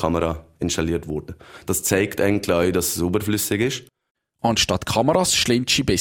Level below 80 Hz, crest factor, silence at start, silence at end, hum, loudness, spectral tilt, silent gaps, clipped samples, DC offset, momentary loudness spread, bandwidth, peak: -42 dBFS; 18 dB; 0 s; 0 s; none; -21 LUFS; -3.5 dB/octave; 4.11-4.15 s; under 0.1%; under 0.1%; 10 LU; 17.5 kHz; -2 dBFS